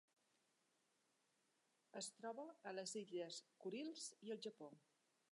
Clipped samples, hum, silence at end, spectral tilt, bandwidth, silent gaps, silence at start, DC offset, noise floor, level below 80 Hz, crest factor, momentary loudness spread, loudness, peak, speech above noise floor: under 0.1%; none; 0.55 s; -3 dB/octave; 11.5 kHz; none; 1.95 s; under 0.1%; -85 dBFS; under -90 dBFS; 18 dB; 6 LU; -53 LUFS; -38 dBFS; 32 dB